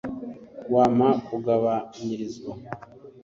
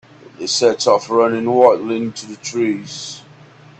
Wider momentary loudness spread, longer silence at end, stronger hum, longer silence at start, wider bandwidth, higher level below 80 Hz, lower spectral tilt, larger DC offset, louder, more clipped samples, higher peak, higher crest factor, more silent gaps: first, 20 LU vs 16 LU; second, 0.05 s vs 0.6 s; neither; second, 0.05 s vs 0.4 s; second, 7.4 kHz vs 9 kHz; about the same, -60 dBFS vs -62 dBFS; first, -7.5 dB/octave vs -4 dB/octave; neither; second, -24 LUFS vs -16 LUFS; neither; second, -8 dBFS vs 0 dBFS; about the same, 18 dB vs 18 dB; neither